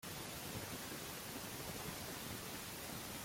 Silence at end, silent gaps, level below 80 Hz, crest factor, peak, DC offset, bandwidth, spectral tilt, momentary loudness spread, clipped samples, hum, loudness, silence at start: 0 s; none; -66 dBFS; 14 dB; -32 dBFS; under 0.1%; 16.5 kHz; -3 dB/octave; 1 LU; under 0.1%; none; -46 LUFS; 0 s